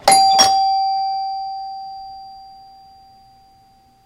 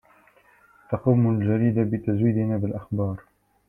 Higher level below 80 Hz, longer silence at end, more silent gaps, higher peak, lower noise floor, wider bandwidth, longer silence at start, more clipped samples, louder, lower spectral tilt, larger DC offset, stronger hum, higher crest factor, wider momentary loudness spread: about the same, -56 dBFS vs -56 dBFS; first, 1.5 s vs 0.5 s; neither; first, 0 dBFS vs -6 dBFS; second, -52 dBFS vs -57 dBFS; first, 16.5 kHz vs 3.1 kHz; second, 0.05 s vs 0.9 s; neither; first, -16 LUFS vs -24 LUFS; second, 0 dB/octave vs -12 dB/octave; neither; second, none vs 50 Hz at -45 dBFS; about the same, 20 dB vs 18 dB; first, 24 LU vs 9 LU